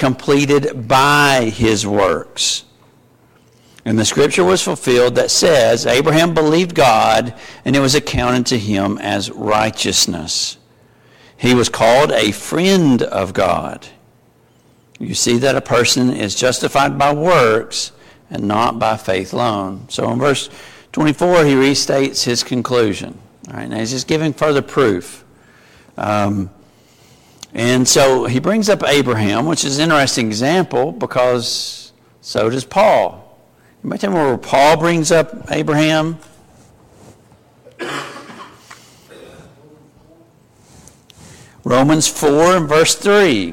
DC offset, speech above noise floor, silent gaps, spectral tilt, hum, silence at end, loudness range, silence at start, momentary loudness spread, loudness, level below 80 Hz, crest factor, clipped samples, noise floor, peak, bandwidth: under 0.1%; 37 dB; none; -4 dB/octave; none; 0 s; 6 LU; 0 s; 12 LU; -14 LUFS; -44 dBFS; 14 dB; under 0.1%; -52 dBFS; -2 dBFS; 16.5 kHz